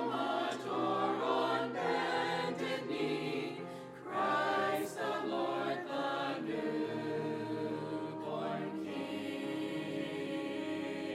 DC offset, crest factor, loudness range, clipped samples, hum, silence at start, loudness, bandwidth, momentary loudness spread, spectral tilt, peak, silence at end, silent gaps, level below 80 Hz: under 0.1%; 16 dB; 4 LU; under 0.1%; none; 0 s; -36 LUFS; 16 kHz; 7 LU; -5.5 dB/octave; -20 dBFS; 0 s; none; -78 dBFS